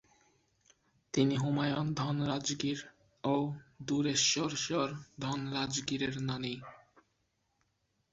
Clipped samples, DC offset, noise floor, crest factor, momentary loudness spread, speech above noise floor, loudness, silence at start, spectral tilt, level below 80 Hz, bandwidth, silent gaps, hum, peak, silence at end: under 0.1%; under 0.1%; -79 dBFS; 20 dB; 12 LU; 45 dB; -33 LUFS; 1.15 s; -4.5 dB/octave; -68 dBFS; 8 kHz; none; none; -16 dBFS; 1.35 s